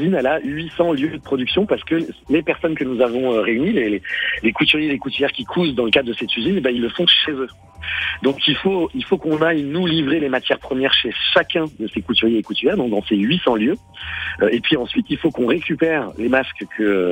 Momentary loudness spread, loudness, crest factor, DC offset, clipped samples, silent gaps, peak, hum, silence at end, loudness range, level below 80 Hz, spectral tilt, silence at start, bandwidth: 6 LU; -18 LUFS; 16 dB; under 0.1%; under 0.1%; none; -2 dBFS; none; 0 s; 2 LU; -50 dBFS; -6.5 dB/octave; 0 s; 16.5 kHz